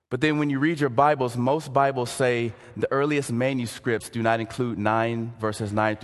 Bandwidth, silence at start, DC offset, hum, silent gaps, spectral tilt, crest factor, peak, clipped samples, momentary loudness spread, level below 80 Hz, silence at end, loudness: 12.5 kHz; 0.1 s; under 0.1%; none; none; -6 dB/octave; 20 dB; -4 dBFS; under 0.1%; 7 LU; -58 dBFS; 0 s; -24 LUFS